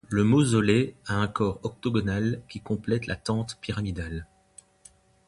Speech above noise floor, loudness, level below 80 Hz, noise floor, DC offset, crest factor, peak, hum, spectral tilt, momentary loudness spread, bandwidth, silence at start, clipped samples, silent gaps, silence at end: 31 dB; -27 LUFS; -48 dBFS; -57 dBFS; under 0.1%; 18 dB; -8 dBFS; none; -6.5 dB/octave; 12 LU; 11.5 kHz; 0.1 s; under 0.1%; none; 1.05 s